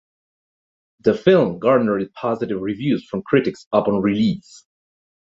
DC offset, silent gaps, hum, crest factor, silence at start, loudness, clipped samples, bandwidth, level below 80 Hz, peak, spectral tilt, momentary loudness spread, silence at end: under 0.1%; 3.67-3.71 s; none; 18 dB; 1.05 s; -19 LUFS; under 0.1%; 7.8 kHz; -56 dBFS; -2 dBFS; -7.5 dB/octave; 8 LU; 0.9 s